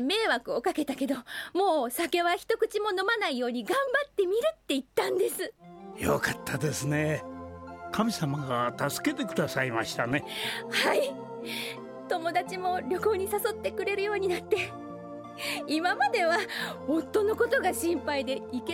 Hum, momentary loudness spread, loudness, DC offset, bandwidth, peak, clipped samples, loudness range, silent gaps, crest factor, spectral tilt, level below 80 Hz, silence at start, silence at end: none; 9 LU; -29 LUFS; under 0.1%; 18 kHz; -12 dBFS; under 0.1%; 3 LU; none; 18 dB; -4 dB/octave; -62 dBFS; 0 s; 0 s